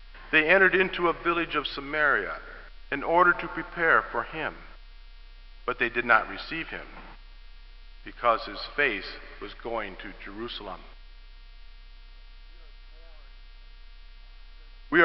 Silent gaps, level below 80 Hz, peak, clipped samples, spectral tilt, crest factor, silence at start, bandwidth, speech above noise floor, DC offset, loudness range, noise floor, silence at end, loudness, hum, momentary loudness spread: none; -46 dBFS; -6 dBFS; under 0.1%; -7.5 dB/octave; 24 dB; 0 s; 6 kHz; 20 dB; 0.1%; 15 LU; -47 dBFS; 0 s; -26 LUFS; none; 20 LU